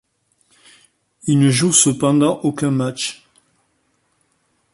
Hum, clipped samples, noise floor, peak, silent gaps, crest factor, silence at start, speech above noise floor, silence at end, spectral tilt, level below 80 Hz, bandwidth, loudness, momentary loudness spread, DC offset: none; under 0.1%; -65 dBFS; 0 dBFS; none; 20 dB; 1.25 s; 49 dB; 1.6 s; -4.5 dB/octave; -58 dBFS; 11.5 kHz; -16 LUFS; 12 LU; under 0.1%